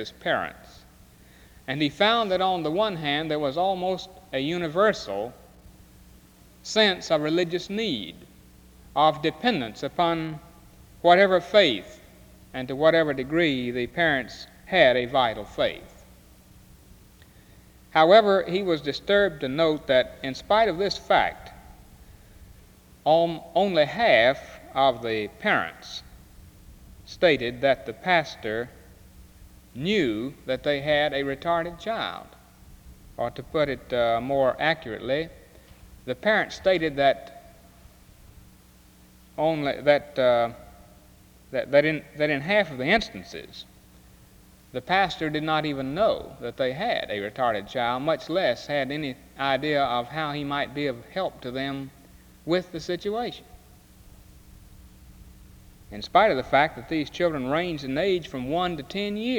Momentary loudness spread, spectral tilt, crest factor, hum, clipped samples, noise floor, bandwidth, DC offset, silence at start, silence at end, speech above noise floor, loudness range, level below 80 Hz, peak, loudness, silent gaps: 13 LU; -5 dB/octave; 22 dB; none; under 0.1%; -53 dBFS; over 20 kHz; under 0.1%; 0 s; 0 s; 29 dB; 6 LU; -54 dBFS; -4 dBFS; -24 LUFS; none